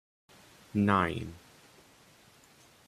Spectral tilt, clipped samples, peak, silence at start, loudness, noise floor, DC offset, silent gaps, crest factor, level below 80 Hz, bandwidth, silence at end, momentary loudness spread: -7 dB/octave; under 0.1%; -12 dBFS; 0.75 s; -30 LUFS; -60 dBFS; under 0.1%; none; 22 dB; -64 dBFS; 14 kHz; 1.5 s; 19 LU